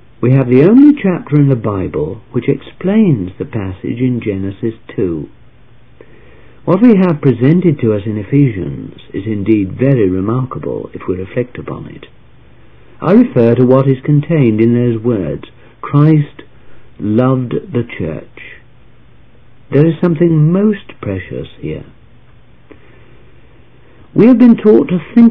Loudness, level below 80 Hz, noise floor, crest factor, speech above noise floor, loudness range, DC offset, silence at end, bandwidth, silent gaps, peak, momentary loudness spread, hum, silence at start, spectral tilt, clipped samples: -12 LUFS; -44 dBFS; -45 dBFS; 12 dB; 33 dB; 7 LU; 1%; 0 s; 5 kHz; none; 0 dBFS; 16 LU; none; 0.2 s; -12 dB/octave; 0.8%